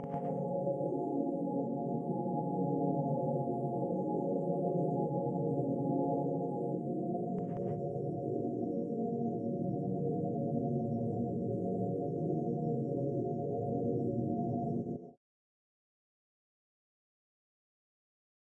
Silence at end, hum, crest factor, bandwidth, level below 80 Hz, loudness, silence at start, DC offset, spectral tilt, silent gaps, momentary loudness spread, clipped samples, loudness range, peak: 3.3 s; none; 14 dB; 2.4 kHz; -72 dBFS; -35 LUFS; 0 s; under 0.1%; -13 dB/octave; none; 3 LU; under 0.1%; 4 LU; -20 dBFS